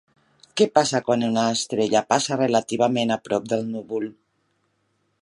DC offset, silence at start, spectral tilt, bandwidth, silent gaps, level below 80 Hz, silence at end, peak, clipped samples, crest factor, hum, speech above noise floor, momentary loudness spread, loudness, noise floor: under 0.1%; 0.55 s; -4 dB/octave; 11.5 kHz; none; -68 dBFS; 1.1 s; -2 dBFS; under 0.1%; 22 dB; none; 48 dB; 9 LU; -22 LUFS; -70 dBFS